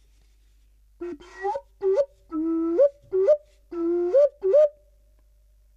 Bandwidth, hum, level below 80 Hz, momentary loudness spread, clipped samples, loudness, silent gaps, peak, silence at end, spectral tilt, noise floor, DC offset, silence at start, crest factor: 7 kHz; none; -58 dBFS; 17 LU; under 0.1%; -23 LUFS; none; -10 dBFS; 1.05 s; -7 dB/octave; -58 dBFS; under 0.1%; 1 s; 14 dB